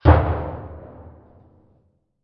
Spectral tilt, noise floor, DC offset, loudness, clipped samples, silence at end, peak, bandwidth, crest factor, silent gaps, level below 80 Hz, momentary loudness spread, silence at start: -11 dB/octave; -63 dBFS; under 0.1%; -21 LUFS; under 0.1%; 1.35 s; 0 dBFS; 5 kHz; 22 dB; none; -30 dBFS; 26 LU; 0.05 s